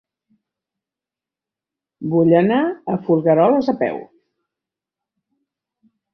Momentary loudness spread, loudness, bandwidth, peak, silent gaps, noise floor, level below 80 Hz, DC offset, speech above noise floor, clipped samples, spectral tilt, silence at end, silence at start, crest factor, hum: 10 LU; -17 LUFS; 6 kHz; -2 dBFS; none; -88 dBFS; -64 dBFS; under 0.1%; 72 dB; under 0.1%; -9.5 dB/octave; 2.1 s; 2 s; 18 dB; none